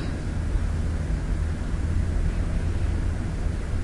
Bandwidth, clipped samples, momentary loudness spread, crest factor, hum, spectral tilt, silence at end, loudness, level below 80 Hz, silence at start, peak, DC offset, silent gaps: 11.5 kHz; under 0.1%; 2 LU; 12 dB; none; -7 dB/octave; 0 s; -28 LUFS; -28 dBFS; 0 s; -12 dBFS; under 0.1%; none